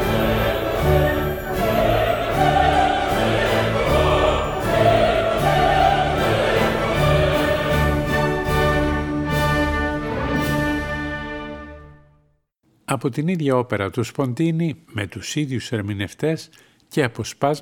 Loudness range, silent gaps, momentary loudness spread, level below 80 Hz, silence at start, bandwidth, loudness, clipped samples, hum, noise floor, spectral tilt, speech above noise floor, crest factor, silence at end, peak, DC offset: 7 LU; none; 9 LU; -32 dBFS; 0 s; 19 kHz; -20 LUFS; under 0.1%; none; -63 dBFS; -6 dB/octave; 41 dB; 18 dB; 0 s; -2 dBFS; under 0.1%